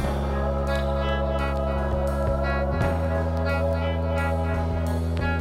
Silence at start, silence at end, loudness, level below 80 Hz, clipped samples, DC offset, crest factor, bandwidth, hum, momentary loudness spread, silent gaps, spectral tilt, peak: 0 s; 0 s; -25 LUFS; -28 dBFS; under 0.1%; under 0.1%; 12 dB; 13 kHz; none; 2 LU; none; -7.5 dB/octave; -12 dBFS